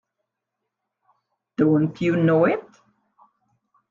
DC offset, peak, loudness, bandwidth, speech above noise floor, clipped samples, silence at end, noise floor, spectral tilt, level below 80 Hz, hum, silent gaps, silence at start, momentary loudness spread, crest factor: under 0.1%; -8 dBFS; -20 LUFS; 7.2 kHz; 63 dB; under 0.1%; 1.3 s; -82 dBFS; -9 dB/octave; -66 dBFS; none; none; 1.6 s; 9 LU; 18 dB